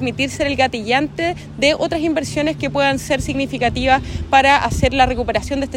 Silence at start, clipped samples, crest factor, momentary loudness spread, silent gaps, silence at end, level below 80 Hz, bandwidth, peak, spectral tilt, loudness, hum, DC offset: 0 s; under 0.1%; 16 dB; 6 LU; none; 0 s; -34 dBFS; 16 kHz; 0 dBFS; -4.5 dB/octave; -17 LUFS; none; under 0.1%